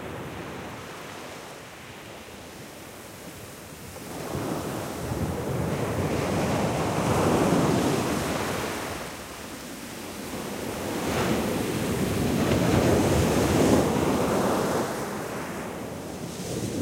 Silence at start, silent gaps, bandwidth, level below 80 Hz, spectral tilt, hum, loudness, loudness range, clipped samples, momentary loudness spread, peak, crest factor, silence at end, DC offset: 0 s; none; 16 kHz; -44 dBFS; -5.5 dB/octave; none; -27 LUFS; 15 LU; under 0.1%; 19 LU; -8 dBFS; 20 dB; 0 s; under 0.1%